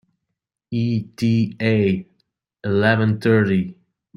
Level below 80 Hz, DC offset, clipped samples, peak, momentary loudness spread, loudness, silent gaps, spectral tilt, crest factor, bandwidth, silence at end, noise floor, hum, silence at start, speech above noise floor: -58 dBFS; under 0.1%; under 0.1%; -2 dBFS; 10 LU; -20 LUFS; none; -8 dB/octave; 18 dB; 11 kHz; 0.45 s; -80 dBFS; none; 0.7 s; 62 dB